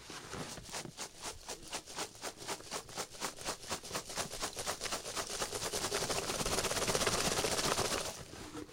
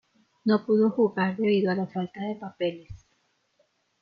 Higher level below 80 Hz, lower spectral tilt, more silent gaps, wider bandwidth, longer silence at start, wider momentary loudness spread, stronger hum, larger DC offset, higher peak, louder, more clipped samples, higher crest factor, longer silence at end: first, -56 dBFS vs -62 dBFS; second, -2 dB/octave vs -9 dB/octave; neither; first, 16.5 kHz vs 5.4 kHz; second, 0 s vs 0.45 s; about the same, 12 LU vs 11 LU; neither; neither; second, -16 dBFS vs -12 dBFS; second, -37 LUFS vs -26 LUFS; neither; first, 24 dB vs 16 dB; second, 0 s vs 1.05 s